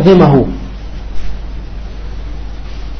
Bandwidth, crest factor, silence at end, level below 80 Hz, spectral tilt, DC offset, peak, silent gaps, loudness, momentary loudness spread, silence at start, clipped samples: 6.4 kHz; 14 dB; 0 s; -24 dBFS; -9 dB/octave; under 0.1%; 0 dBFS; none; -10 LUFS; 20 LU; 0 s; under 0.1%